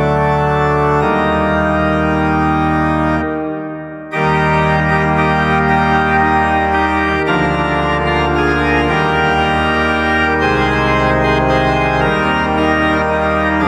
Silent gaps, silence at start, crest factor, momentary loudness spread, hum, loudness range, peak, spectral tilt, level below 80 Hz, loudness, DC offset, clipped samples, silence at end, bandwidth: none; 0 s; 14 dB; 2 LU; none; 2 LU; 0 dBFS; -7 dB/octave; -30 dBFS; -14 LUFS; under 0.1%; under 0.1%; 0 s; 11.5 kHz